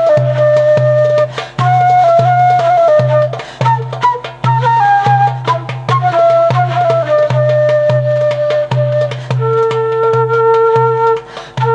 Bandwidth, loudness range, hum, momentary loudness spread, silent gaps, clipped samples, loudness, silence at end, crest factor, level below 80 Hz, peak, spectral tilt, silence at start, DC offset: 8.2 kHz; 2 LU; none; 7 LU; none; under 0.1%; -11 LUFS; 0 s; 10 dB; -52 dBFS; 0 dBFS; -7 dB/octave; 0 s; under 0.1%